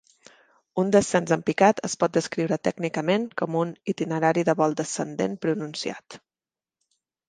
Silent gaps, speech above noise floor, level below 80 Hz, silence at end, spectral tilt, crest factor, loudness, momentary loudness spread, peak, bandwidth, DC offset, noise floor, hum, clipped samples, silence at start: none; over 66 dB; -66 dBFS; 1.1 s; -5 dB/octave; 22 dB; -25 LUFS; 9 LU; -4 dBFS; 10 kHz; under 0.1%; under -90 dBFS; none; under 0.1%; 0.75 s